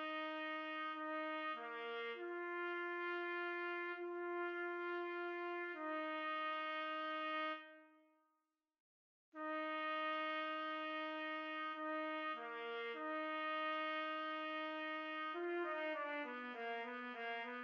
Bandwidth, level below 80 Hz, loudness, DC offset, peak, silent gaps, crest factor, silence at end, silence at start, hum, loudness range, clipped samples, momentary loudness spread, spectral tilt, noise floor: 6.8 kHz; under -90 dBFS; -44 LUFS; under 0.1%; -30 dBFS; 8.80-9.32 s; 14 dB; 0 s; 0 s; none; 3 LU; under 0.1%; 4 LU; 2 dB/octave; -88 dBFS